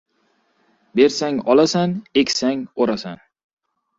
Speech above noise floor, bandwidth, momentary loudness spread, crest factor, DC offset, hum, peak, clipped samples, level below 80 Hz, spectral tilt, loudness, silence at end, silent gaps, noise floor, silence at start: 47 dB; 7.8 kHz; 9 LU; 18 dB; under 0.1%; none; -2 dBFS; under 0.1%; -60 dBFS; -4.5 dB/octave; -19 LUFS; 0.85 s; none; -65 dBFS; 0.95 s